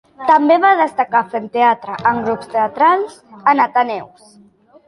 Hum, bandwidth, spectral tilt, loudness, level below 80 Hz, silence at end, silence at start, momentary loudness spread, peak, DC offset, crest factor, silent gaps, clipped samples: none; 11.5 kHz; -5.5 dB/octave; -15 LUFS; -60 dBFS; 0.8 s; 0.2 s; 9 LU; -2 dBFS; under 0.1%; 14 dB; none; under 0.1%